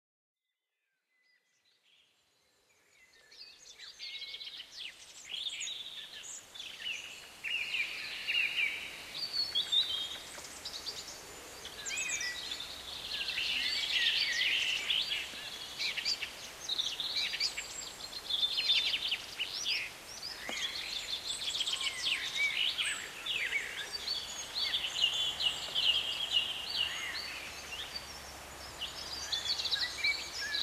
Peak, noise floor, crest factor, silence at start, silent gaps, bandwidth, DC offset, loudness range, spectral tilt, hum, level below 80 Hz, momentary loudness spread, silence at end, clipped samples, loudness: -18 dBFS; -88 dBFS; 20 dB; 3 s; none; 16 kHz; under 0.1%; 10 LU; 1 dB/octave; none; -66 dBFS; 15 LU; 0 s; under 0.1%; -33 LUFS